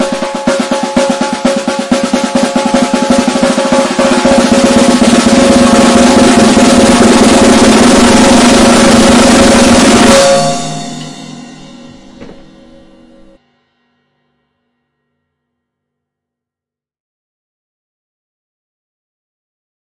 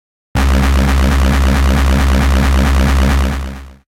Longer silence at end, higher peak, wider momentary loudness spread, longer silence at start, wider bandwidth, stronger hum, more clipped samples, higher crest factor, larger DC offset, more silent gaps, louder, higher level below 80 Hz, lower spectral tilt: first, 7.65 s vs 0.15 s; first, 0 dBFS vs -6 dBFS; first, 9 LU vs 6 LU; second, 0 s vs 0.35 s; second, 12 kHz vs 15.5 kHz; neither; first, 1% vs under 0.1%; about the same, 10 dB vs 6 dB; second, under 0.1% vs 0.8%; neither; first, -6 LUFS vs -13 LUFS; second, -32 dBFS vs -12 dBFS; second, -4 dB/octave vs -6 dB/octave